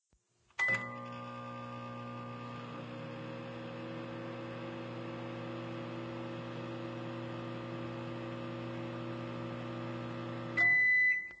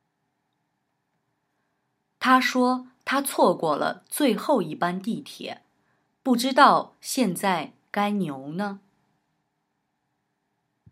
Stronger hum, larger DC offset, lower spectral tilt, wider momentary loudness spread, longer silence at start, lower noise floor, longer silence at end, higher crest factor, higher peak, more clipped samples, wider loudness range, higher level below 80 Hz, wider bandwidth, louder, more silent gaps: neither; neither; first, -6 dB/octave vs -4 dB/octave; about the same, 16 LU vs 15 LU; second, 0.6 s vs 2.2 s; about the same, -74 dBFS vs -76 dBFS; second, 0 s vs 2.15 s; second, 18 dB vs 24 dB; second, -20 dBFS vs -2 dBFS; neither; first, 11 LU vs 6 LU; first, -70 dBFS vs -82 dBFS; second, 8 kHz vs 16 kHz; second, -36 LUFS vs -24 LUFS; neither